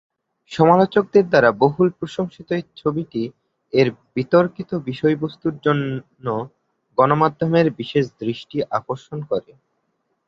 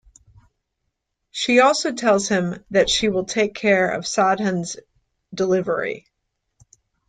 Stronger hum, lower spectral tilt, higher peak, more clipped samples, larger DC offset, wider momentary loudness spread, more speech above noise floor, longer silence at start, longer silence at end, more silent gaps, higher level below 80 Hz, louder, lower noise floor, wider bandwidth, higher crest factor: neither; first, -8 dB/octave vs -4 dB/octave; about the same, -2 dBFS vs -2 dBFS; neither; neither; about the same, 12 LU vs 14 LU; second, 52 dB vs 57 dB; second, 0.5 s vs 1.35 s; second, 0.9 s vs 1.1 s; neither; about the same, -58 dBFS vs -54 dBFS; about the same, -20 LUFS vs -20 LUFS; second, -71 dBFS vs -77 dBFS; second, 7.8 kHz vs 9.6 kHz; about the same, 18 dB vs 18 dB